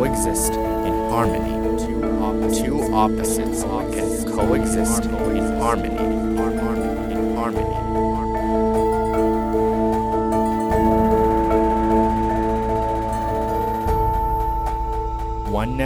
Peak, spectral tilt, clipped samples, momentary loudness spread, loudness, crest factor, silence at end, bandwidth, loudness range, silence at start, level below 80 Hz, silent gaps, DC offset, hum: -4 dBFS; -6 dB/octave; under 0.1%; 5 LU; -21 LUFS; 16 dB; 0 s; 19 kHz; 3 LU; 0 s; -30 dBFS; none; under 0.1%; none